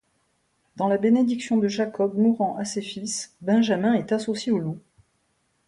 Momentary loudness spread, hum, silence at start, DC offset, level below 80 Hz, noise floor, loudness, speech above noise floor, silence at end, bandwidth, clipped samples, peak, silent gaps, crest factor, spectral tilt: 9 LU; none; 0.75 s; under 0.1%; -68 dBFS; -70 dBFS; -24 LUFS; 47 dB; 0.9 s; 11.5 kHz; under 0.1%; -10 dBFS; none; 14 dB; -5.5 dB/octave